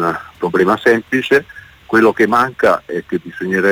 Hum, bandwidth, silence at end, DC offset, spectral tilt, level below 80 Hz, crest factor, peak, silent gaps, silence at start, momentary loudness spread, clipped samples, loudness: none; 19.5 kHz; 0 s; under 0.1%; -6 dB/octave; -52 dBFS; 12 dB; -2 dBFS; none; 0 s; 10 LU; under 0.1%; -15 LUFS